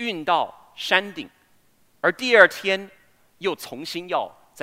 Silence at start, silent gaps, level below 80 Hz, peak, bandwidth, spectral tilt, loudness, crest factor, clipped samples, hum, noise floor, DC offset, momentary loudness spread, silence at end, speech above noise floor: 0 s; none; -74 dBFS; 0 dBFS; 16 kHz; -3 dB/octave; -22 LUFS; 24 dB; under 0.1%; none; -60 dBFS; under 0.1%; 19 LU; 0.35 s; 38 dB